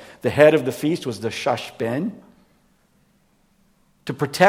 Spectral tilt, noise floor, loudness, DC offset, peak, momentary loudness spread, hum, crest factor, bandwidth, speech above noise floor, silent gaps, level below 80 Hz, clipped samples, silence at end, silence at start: -5.5 dB/octave; -61 dBFS; -21 LUFS; under 0.1%; 0 dBFS; 14 LU; none; 22 dB; 16 kHz; 42 dB; none; -62 dBFS; under 0.1%; 0 s; 0 s